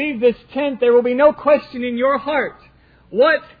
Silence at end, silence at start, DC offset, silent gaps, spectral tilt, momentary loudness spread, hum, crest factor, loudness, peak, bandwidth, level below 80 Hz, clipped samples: 0.15 s; 0 s; under 0.1%; none; -8 dB/octave; 9 LU; none; 14 dB; -17 LUFS; -2 dBFS; 5 kHz; -54 dBFS; under 0.1%